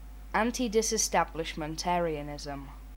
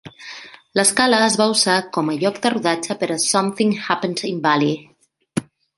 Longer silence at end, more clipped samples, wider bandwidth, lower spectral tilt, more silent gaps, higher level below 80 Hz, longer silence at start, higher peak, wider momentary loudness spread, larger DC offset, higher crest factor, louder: second, 0 s vs 0.35 s; neither; first, 19 kHz vs 12 kHz; about the same, -3 dB/octave vs -3 dB/octave; neither; first, -46 dBFS vs -62 dBFS; about the same, 0 s vs 0.05 s; second, -12 dBFS vs 0 dBFS; about the same, 12 LU vs 13 LU; neither; about the same, 18 dB vs 18 dB; second, -30 LUFS vs -18 LUFS